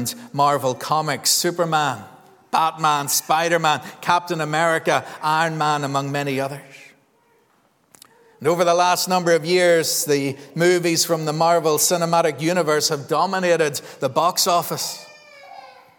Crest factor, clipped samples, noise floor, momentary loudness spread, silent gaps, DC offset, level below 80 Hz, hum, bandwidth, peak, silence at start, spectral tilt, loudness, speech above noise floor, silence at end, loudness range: 18 dB; under 0.1%; -61 dBFS; 7 LU; none; under 0.1%; -74 dBFS; none; 19.5 kHz; -2 dBFS; 0 s; -3 dB/octave; -19 LUFS; 41 dB; 0.3 s; 5 LU